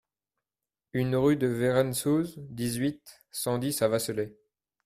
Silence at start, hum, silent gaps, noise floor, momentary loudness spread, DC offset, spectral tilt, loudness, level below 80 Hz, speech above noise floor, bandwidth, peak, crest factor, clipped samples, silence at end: 0.95 s; none; none; under -90 dBFS; 11 LU; under 0.1%; -5.5 dB/octave; -28 LUFS; -60 dBFS; over 62 dB; 16 kHz; -12 dBFS; 18 dB; under 0.1%; 0.55 s